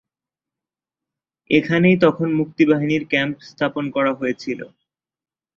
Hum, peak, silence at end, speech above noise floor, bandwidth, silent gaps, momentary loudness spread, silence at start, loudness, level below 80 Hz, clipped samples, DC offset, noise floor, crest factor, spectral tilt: none; -2 dBFS; 0.9 s; 70 dB; 7.2 kHz; none; 12 LU; 1.5 s; -19 LUFS; -60 dBFS; under 0.1%; under 0.1%; -89 dBFS; 20 dB; -7.5 dB/octave